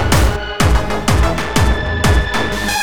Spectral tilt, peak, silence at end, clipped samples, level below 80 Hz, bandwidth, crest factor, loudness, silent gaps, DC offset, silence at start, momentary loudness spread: -4.5 dB/octave; 0 dBFS; 0 s; under 0.1%; -18 dBFS; over 20 kHz; 14 dB; -15 LUFS; none; 6%; 0 s; 3 LU